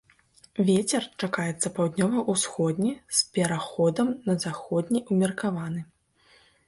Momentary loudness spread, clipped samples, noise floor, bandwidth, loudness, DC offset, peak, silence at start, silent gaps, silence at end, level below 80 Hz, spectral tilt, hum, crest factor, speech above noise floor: 6 LU; under 0.1%; -61 dBFS; 11.5 kHz; -26 LUFS; under 0.1%; -10 dBFS; 0.55 s; none; 0.85 s; -64 dBFS; -4.5 dB/octave; none; 18 dB; 35 dB